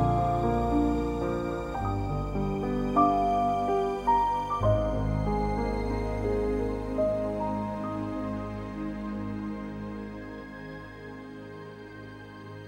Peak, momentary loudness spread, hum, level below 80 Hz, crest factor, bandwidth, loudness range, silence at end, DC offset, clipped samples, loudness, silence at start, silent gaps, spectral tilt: -10 dBFS; 17 LU; none; -38 dBFS; 18 dB; 12.5 kHz; 11 LU; 0 s; under 0.1%; under 0.1%; -29 LUFS; 0 s; none; -8.5 dB/octave